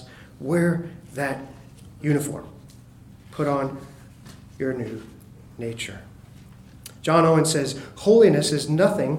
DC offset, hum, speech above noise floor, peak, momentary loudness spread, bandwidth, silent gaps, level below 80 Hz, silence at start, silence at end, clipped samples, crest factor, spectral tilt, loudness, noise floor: under 0.1%; none; 25 dB; -4 dBFS; 22 LU; 16.5 kHz; none; -54 dBFS; 0 s; 0 s; under 0.1%; 20 dB; -5.5 dB/octave; -22 LUFS; -47 dBFS